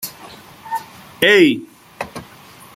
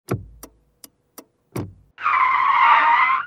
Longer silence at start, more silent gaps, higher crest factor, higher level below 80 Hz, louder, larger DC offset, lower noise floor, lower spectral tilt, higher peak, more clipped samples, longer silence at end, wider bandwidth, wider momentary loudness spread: about the same, 0 s vs 0.1 s; neither; about the same, 18 dB vs 18 dB; about the same, -58 dBFS vs -54 dBFS; about the same, -15 LUFS vs -16 LUFS; neither; second, -42 dBFS vs -51 dBFS; about the same, -4 dB/octave vs -4 dB/octave; about the same, -2 dBFS vs -2 dBFS; neither; first, 0.55 s vs 0 s; about the same, 16.5 kHz vs 16 kHz; first, 27 LU vs 19 LU